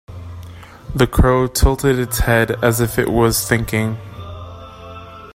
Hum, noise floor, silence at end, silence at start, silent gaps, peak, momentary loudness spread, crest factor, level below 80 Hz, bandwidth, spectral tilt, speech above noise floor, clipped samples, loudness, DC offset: none; -36 dBFS; 0.05 s; 0.1 s; none; 0 dBFS; 20 LU; 18 dB; -26 dBFS; 16 kHz; -5 dB/octave; 20 dB; under 0.1%; -16 LUFS; under 0.1%